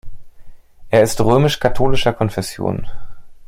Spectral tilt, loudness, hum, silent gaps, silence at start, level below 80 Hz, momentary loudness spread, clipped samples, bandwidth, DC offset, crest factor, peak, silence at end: -5.5 dB/octave; -17 LUFS; none; none; 0.05 s; -32 dBFS; 9 LU; under 0.1%; 16.5 kHz; under 0.1%; 16 dB; -2 dBFS; 0.05 s